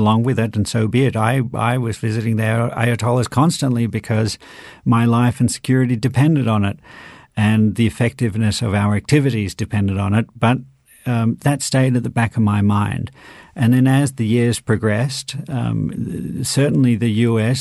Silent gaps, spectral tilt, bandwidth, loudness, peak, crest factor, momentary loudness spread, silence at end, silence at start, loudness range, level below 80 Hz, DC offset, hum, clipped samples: none; -6.5 dB/octave; 12.5 kHz; -18 LUFS; 0 dBFS; 16 dB; 8 LU; 0 s; 0 s; 1 LU; -48 dBFS; under 0.1%; none; under 0.1%